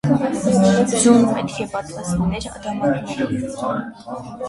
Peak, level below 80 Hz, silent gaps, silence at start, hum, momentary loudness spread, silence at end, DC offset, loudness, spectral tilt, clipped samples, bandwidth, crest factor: -2 dBFS; -44 dBFS; none; 0.05 s; none; 14 LU; 0 s; under 0.1%; -19 LUFS; -5.5 dB/octave; under 0.1%; 11.5 kHz; 18 dB